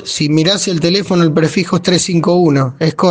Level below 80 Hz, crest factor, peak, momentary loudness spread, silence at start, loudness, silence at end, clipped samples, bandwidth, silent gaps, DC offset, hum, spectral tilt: -50 dBFS; 12 dB; 0 dBFS; 3 LU; 0 s; -12 LUFS; 0 s; under 0.1%; 9.8 kHz; none; under 0.1%; none; -5 dB/octave